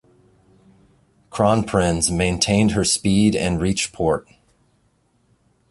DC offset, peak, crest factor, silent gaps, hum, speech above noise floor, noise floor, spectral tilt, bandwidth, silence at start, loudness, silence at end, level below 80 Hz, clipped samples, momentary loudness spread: under 0.1%; -2 dBFS; 18 dB; none; none; 44 dB; -63 dBFS; -4.5 dB/octave; 11.5 kHz; 1.3 s; -19 LUFS; 1.5 s; -40 dBFS; under 0.1%; 5 LU